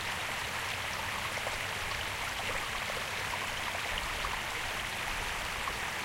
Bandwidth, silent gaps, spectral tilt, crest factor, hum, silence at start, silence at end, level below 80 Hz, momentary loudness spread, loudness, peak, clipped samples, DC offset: 16 kHz; none; -1.5 dB/octave; 16 dB; none; 0 s; 0 s; -50 dBFS; 1 LU; -34 LUFS; -20 dBFS; under 0.1%; under 0.1%